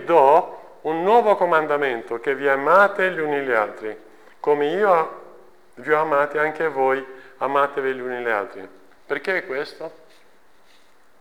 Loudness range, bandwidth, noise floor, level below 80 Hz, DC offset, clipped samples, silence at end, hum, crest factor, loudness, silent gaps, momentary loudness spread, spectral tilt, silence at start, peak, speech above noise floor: 6 LU; 19.5 kHz; -57 dBFS; -72 dBFS; 0.3%; under 0.1%; 1.3 s; none; 18 dB; -20 LUFS; none; 18 LU; -5.5 dB/octave; 0 s; -4 dBFS; 37 dB